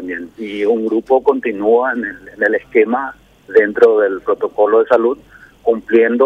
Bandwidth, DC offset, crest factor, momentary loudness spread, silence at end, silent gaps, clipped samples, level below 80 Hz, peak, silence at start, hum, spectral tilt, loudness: 5.2 kHz; under 0.1%; 14 dB; 12 LU; 0 s; none; under 0.1%; -54 dBFS; 0 dBFS; 0 s; none; -6.5 dB/octave; -15 LUFS